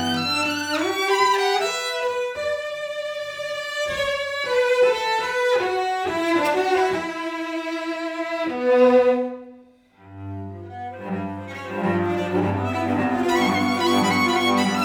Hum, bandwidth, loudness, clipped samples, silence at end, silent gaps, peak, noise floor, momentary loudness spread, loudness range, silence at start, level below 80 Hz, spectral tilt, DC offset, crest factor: none; 20 kHz; -22 LUFS; under 0.1%; 0 s; none; -6 dBFS; -51 dBFS; 12 LU; 5 LU; 0 s; -62 dBFS; -4.5 dB/octave; under 0.1%; 16 dB